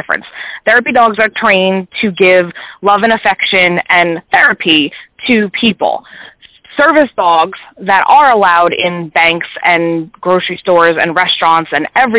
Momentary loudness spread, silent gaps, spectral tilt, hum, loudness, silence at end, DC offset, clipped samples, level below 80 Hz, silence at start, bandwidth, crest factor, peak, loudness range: 9 LU; none; -8 dB/octave; none; -10 LUFS; 0 s; under 0.1%; under 0.1%; -52 dBFS; 0.1 s; 4 kHz; 10 dB; 0 dBFS; 2 LU